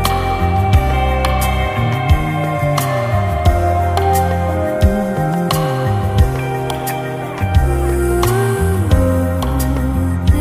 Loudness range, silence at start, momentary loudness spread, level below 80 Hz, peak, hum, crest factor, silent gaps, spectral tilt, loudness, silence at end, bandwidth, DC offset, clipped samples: 1 LU; 0 s; 4 LU; -20 dBFS; 0 dBFS; none; 14 dB; none; -6.5 dB/octave; -16 LUFS; 0 s; 15.5 kHz; under 0.1%; under 0.1%